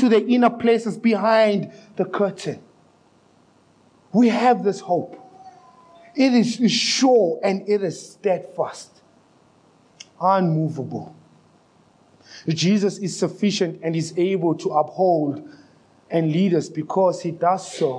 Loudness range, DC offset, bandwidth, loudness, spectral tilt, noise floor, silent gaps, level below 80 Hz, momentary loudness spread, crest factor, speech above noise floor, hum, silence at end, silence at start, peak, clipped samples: 5 LU; under 0.1%; 10.5 kHz; -21 LUFS; -5.5 dB/octave; -57 dBFS; none; -76 dBFS; 12 LU; 18 dB; 37 dB; none; 0 s; 0 s; -4 dBFS; under 0.1%